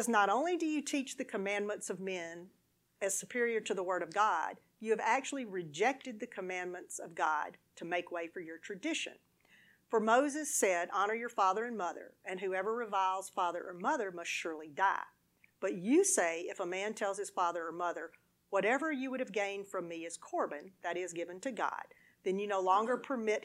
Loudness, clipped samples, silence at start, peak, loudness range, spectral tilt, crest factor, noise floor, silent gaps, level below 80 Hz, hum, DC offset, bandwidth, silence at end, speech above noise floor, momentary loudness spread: -35 LUFS; under 0.1%; 0 s; -16 dBFS; 5 LU; -3 dB/octave; 20 dB; -66 dBFS; none; -88 dBFS; none; under 0.1%; 16 kHz; 0 s; 31 dB; 12 LU